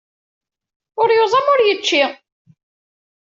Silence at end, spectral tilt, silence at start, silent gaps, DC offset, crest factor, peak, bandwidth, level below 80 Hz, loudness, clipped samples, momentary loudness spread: 1.1 s; -2 dB/octave; 0.95 s; none; under 0.1%; 16 dB; -2 dBFS; 7.6 kHz; -72 dBFS; -15 LUFS; under 0.1%; 7 LU